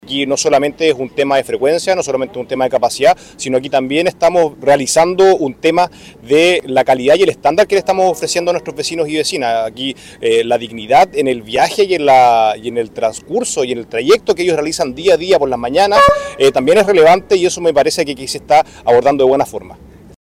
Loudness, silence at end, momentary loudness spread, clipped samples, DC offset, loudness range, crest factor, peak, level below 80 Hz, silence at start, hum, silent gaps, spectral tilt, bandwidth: -13 LUFS; 0.5 s; 9 LU; under 0.1%; under 0.1%; 4 LU; 10 dB; -2 dBFS; -46 dBFS; 0.05 s; none; none; -3.5 dB/octave; 16 kHz